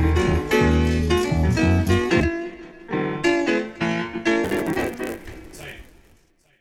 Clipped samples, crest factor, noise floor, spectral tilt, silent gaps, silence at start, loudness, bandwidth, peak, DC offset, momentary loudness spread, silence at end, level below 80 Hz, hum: under 0.1%; 16 dB; -58 dBFS; -6.5 dB/octave; none; 0 s; -21 LUFS; 16.5 kHz; -6 dBFS; under 0.1%; 18 LU; 0.8 s; -32 dBFS; none